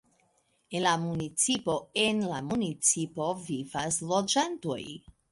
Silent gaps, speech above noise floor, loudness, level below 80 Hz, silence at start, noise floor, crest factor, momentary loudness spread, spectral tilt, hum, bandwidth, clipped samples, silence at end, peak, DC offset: none; 41 dB; -29 LUFS; -64 dBFS; 0.7 s; -71 dBFS; 20 dB; 10 LU; -3 dB/octave; none; 11.5 kHz; under 0.1%; 0.35 s; -12 dBFS; under 0.1%